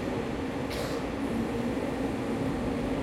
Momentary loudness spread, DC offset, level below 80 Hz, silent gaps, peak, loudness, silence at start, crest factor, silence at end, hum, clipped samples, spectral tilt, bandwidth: 2 LU; under 0.1%; -46 dBFS; none; -18 dBFS; -32 LUFS; 0 s; 14 dB; 0 s; none; under 0.1%; -6.5 dB/octave; 16 kHz